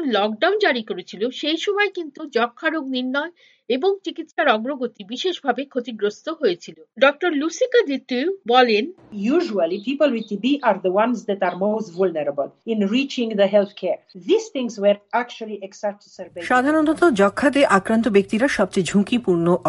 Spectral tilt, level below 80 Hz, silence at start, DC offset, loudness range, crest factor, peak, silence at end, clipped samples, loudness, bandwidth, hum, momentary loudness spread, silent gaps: -5 dB/octave; -60 dBFS; 0 s; under 0.1%; 5 LU; 20 dB; 0 dBFS; 0 s; under 0.1%; -21 LUFS; 11.5 kHz; none; 11 LU; none